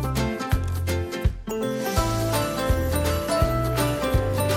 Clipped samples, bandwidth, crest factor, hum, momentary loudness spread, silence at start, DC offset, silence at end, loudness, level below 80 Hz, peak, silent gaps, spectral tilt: under 0.1%; 17 kHz; 14 dB; none; 4 LU; 0 s; under 0.1%; 0 s; -25 LUFS; -32 dBFS; -10 dBFS; none; -5.5 dB/octave